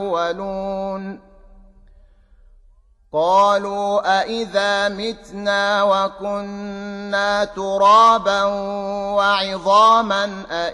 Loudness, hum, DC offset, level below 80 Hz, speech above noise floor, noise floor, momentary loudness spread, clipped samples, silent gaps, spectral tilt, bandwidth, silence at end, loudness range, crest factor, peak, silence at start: -18 LUFS; none; under 0.1%; -50 dBFS; 34 dB; -52 dBFS; 14 LU; under 0.1%; none; -3.5 dB/octave; 11 kHz; 0 s; 7 LU; 16 dB; -4 dBFS; 0 s